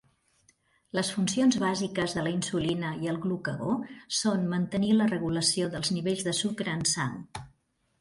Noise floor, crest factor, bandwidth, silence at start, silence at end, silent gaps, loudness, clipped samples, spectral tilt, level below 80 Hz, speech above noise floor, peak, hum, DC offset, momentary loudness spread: -70 dBFS; 18 dB; 11.5 kHz; 0.95 s; 0.5 s; none; -28 LUFS; under 0.1%; -4 dB/octave; -60 dBFS; 41 dB; -12 dBFS; none; under 0.1%; 7 LU